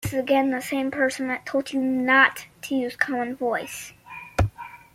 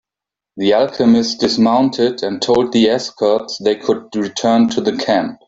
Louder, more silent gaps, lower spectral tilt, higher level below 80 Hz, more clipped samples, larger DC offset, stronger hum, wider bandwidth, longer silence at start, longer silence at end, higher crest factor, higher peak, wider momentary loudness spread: second, -23 LUFS vs -15 LUFS; neither; about the same, -5 dB/octave vs -5 dB/octave; first, -44 dBFS vs -54 dBFS; neither; neither; neither; first, 16 kHz vs 7.8 kHz; second, 0 s vs 0.55 s; about the same, 0.2 s vs 0.1 s; first, 22 dB vs 12 dB; about the same, -4 dBFS vs -2 dBFS; first, 18 LU vs 6 LU